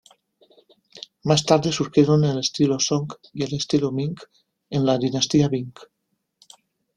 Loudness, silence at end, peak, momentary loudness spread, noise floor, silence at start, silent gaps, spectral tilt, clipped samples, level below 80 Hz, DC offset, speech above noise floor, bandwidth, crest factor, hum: -21 LUFS; 1.1 s; -2 dBFS; 14 LU; -66 dBFS; 0.95 s; none; -5.5 dB/octave; under 0.1%; -58 dBFS; under 0.1%; 45 dB; 11 kHz; 22 dB; none